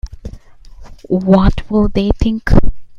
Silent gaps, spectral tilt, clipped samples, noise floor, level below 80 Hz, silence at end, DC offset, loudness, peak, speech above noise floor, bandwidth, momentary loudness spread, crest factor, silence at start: none; -8.5 dB/octave; under 0.1%; -35 dBFS; -20 dBFS; 0 s; under 0.1%; -14 LUFS; 0 dBFS; 24 dB; 7.2 kHz; 20 LU; 12 dB; 0.05 s